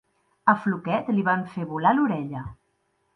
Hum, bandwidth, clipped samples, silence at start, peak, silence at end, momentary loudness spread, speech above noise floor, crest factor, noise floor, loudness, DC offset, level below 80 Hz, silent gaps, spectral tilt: none; 5.8 kHz; under 0.1%; 0.45 s; -4 dBFS; 0.6 s; 12 LU; 47 dB; 22 dB; -71 dBFS; -24 LUFS; under 0.1%; -58 dBFS; none; -9 dB/octave